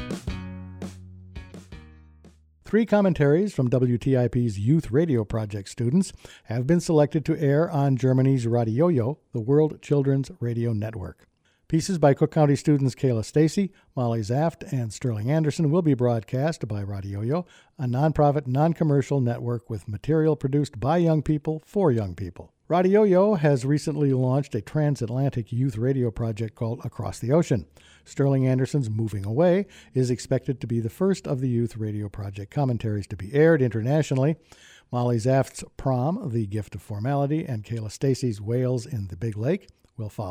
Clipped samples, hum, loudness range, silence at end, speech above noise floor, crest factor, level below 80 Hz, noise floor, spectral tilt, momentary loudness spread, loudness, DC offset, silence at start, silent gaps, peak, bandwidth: under 0.1%; none; 4 LU; 0 s; 30 dB; 16 dB; -50 dBFS; -54 dBFS; -8 dB/octave; 11 LU; -24 LUFS; under 0.1%; 0 s; none; -8 dBFS; 12.5 kHz